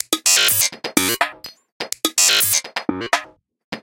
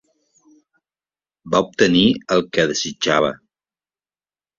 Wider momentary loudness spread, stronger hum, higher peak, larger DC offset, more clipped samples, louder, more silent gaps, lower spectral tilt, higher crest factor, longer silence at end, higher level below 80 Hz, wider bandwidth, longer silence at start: first, 15 LU vs 7 LU; neither; about the same, 0 dBFS vs -2 dBFS; neither; neither; about the same, -16 LUFS vs -18 LUFS; first, 1.72-1.80 s, 3.64-3.72 s vs none; second, 0 dB/octave vs -4 dB/octave; about the same, 20 dB vs 20 dB; second, 0.05 s vs 1.25 s; second, -60 dBFS vs -54 dBFS; first, 17.5 kHz vs 7.6 kHz; second, 0.1 s vs 1.45 s